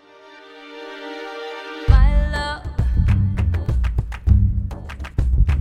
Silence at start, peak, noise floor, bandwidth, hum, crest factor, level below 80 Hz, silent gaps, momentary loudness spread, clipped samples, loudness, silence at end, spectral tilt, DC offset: 0.3 s; 0 dBFS; -44 dBFS; 8.8 kHz; none; 18 dB; -20 dBFS; none; 16 LU; under 0.1%; -21 LUFS; 0 s; -7.5 dB/octave; under 0.1%